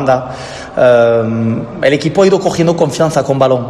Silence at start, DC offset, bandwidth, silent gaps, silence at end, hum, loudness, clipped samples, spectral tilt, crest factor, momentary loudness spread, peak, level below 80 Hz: 0 s; under 0.1%; 13 kHz; none; 0 s; none; -12 LUFS; 0.3%; -6 dB/octave; 12 dB; 8 LU; 0 dBFS; -44 dBFS